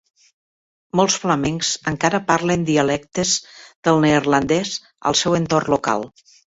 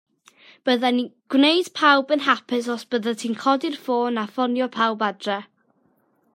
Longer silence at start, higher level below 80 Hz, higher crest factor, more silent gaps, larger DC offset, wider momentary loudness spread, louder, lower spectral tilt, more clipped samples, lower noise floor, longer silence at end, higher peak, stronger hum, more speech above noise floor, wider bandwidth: first, 0.95 s vs 0.65 s; first, -50 dBFS vs -78 dBFS; about the same, 18 dB vs 20 dB; first, 3.76-3.83 s vs none; neither; about the same, 7 LU vs 9 LU; first, -19 LUFS vs -22 LUFS; about the same, -4 dB/octave vs -3.5 dB/octave; neither; first, under -90 dBFS vs -64 dBFS; second, 0.5 s vs 0.9 s; about the same, -2 dBFS vs -2 dBFS; neither; first, over 71 dB vs 43 dB; second, 8 kHz vs 15.5 kHz